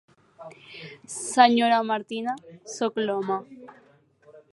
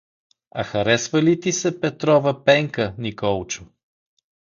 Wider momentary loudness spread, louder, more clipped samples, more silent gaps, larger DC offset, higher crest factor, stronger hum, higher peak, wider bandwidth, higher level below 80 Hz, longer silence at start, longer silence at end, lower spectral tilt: first, 24 LU vs 11 LU; second, -24 LUFS vs -20 LUFS; neither; neither; neither; first, 24 dB vs 18 dB; neither; about the same, -2 dBFS vs -2 dBFS; first, 11.5 kHz vs 7.4 kHz; second, -80 dBFS vs -52 dBFS; second, 0.4 s vs 0.55 s; second, 0.15 s vs 0.75 s; second, -3 dB/octave vs -4.5 dB/octave